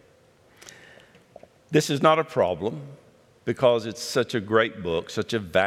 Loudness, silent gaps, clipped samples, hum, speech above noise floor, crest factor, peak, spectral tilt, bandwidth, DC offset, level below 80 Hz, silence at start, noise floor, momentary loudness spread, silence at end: -24 LUFS; none; under 0.1%; none; 34 dB; 20 dB; -4 dBFS; -5 dB/octave; 15.5 kHz; under 0.1%; -64 dBFS; 0.65 s; -57 dBFS; 13 LU; 0 s